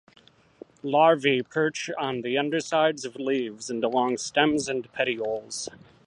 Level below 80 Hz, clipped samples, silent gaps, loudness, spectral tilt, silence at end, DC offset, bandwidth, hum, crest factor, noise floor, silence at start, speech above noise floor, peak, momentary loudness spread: -68 dBFS; under 0.1%; none; -25 LUFS; -4 dB/octave; 0.3 s; under 0.1%; 11 kHz; none; 22 dB; -50 dBFS; 0.85 s; 25 dB; -4 dBFS; 11 LU